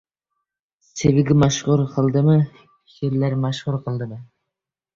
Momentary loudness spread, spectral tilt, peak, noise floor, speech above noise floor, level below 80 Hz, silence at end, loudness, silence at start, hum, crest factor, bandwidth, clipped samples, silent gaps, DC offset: 12 LU; -6.5 dB/octave; -4 dBFS; -85 dBFS; 66 dB; -48 dBFS; 0.75 s; -20 LUFS; 0.95 s; none; 18 dB; 7.6 kHz; under 0.1%; none; under 0.1%